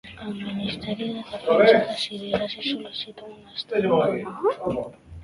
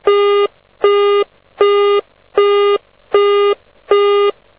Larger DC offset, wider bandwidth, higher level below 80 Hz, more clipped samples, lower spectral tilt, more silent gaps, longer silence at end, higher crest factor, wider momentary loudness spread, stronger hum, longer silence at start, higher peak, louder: second, under 0.1% vs 0.3%; first, 11.5 kHz vs 3.9 kHz; first, -54 dBFS vs -60 dBFS; neither; about the same, -6 dB/octave vs -6.5 dB/octave; neither; second, 0 s vs 0.25 s; first, 22 dB vs 14 dB; first, 17 LU vs 8 LU; neither; about the same, 0.05 s vs 0.05 s; about the same, -2 dBFS vs 0 dBFS; second, -24 LUFS vs -14 LUFS